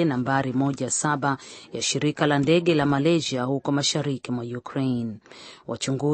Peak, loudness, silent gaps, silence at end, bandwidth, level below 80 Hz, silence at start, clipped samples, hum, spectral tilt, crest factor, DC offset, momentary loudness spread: -6 dBFS; -24 LUFS; none; 0 s; 8.8 kHz; -60 dBFS; 0 s; under 0.1%; none; -4.5 dB/octave; 18 dB; under 0.1%; 13 LU